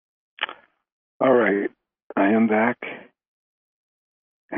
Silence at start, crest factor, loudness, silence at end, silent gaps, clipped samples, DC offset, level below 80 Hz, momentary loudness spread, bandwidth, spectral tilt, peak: 0.4 s; 20 dB; -22 LUFS; 0 s; 0.92-1.20 s, 2.02-2.10 s, 3.27-4.49 s; under 0.1%; under 0.1%; -72 dBFS; 14 LU; 3.7 kHz; -4 dB/octave; -6 dBFS